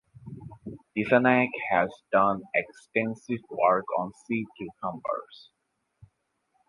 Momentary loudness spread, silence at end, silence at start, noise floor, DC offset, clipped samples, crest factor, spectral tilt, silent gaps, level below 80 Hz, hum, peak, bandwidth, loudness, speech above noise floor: 20 LU; 1.35 s; 0.25 s; -75 dBFS; under 0.1%; under 0.1%; 24 dB; -7 dB/octave; none; -64 dBFS; none; -6 dBFS; 11 kHz; -27 LUFS; 48 dB